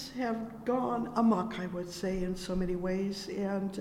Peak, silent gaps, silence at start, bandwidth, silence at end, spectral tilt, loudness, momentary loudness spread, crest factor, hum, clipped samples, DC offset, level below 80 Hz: -18 dBFS; none; 0 s; 15.5 kHz; 0 s; -6.5 dB/octave; -33 LUFS; 8 LU; 16 dB; none; under 0.1%; under 0.1%; -50 dBFS